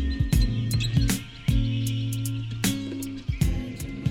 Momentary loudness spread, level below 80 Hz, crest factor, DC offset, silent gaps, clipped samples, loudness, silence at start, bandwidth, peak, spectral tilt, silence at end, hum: 8 LU; -30 dBFS; 16 dB; under 0.1%; none; under 0.1%; -27 LUFS; 0 s; 17 kHz; -10 dBFS; -5 dB/octave; 0 s; none